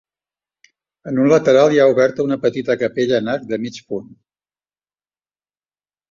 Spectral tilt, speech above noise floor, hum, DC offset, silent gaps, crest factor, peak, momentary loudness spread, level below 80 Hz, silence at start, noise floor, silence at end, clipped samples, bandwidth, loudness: -6 dB/octave; over 74 dB; 50 Hz at -55 dBFS; under 0.1%; none; 18 dB; 0 dBFS; 16 LU; -62 dBFS; 1.05 s; under -90 dBFS; 2.1 s; under 0.1%; 7.4 kHz; -16 LUFS